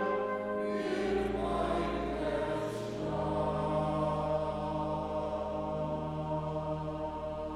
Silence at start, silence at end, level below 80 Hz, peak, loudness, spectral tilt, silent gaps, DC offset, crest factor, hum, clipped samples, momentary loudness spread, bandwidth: 0 s; 0 s; -48 dBFS; -20 dBFS; -34 LUFS; -7 dB/octave; none; under 0.1%; 12 dB; none; under 0.1%; 5 LU; 12.5 kHz